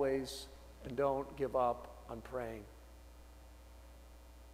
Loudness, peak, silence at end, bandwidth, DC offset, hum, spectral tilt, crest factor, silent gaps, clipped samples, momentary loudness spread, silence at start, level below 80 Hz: -39 LUFS; -22 dBFS; 0 s; 16 kHz; under 0.1%; none; -5.5 dB/octave; 18 dB; none; under 0.1%; 23 LU; 0 s; -56 dBFS